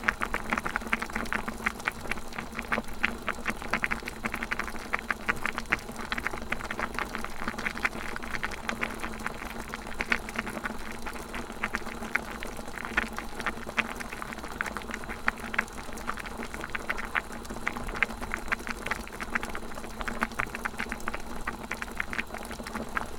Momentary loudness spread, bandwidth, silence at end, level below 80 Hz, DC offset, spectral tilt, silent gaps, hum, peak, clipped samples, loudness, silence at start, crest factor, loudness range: 7 LU; 18 kHz; 0 s; -44 dBFS; under 0.1%; -3.5 dB/octave; none; none; -4 dBFS; under 0.1%; -33 LUFS; 0 s; 30 dB; 3 LU